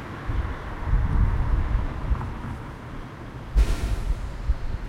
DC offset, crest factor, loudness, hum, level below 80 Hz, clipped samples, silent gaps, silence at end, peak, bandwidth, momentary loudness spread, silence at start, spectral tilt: under 0.1%; 16 dB; -29 LUFS; none; -26 dBFS; under 0.1%; none; 0 s; -8 dBFS; 11 kHz; 13 LU; 0 s; -7 dB/octave